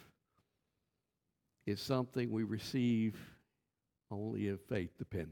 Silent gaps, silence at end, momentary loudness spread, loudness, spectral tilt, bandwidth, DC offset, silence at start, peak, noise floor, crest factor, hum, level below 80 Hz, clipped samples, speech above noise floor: none; 0 s; 13 LU; -39 LUFS; -7 dB/octave; 17.5 kHz; under 0.1%; 0 s; -20 dBFS; -88 dBFS; 20 dB; none; -68 dBFS; under 0.1%; 50 dB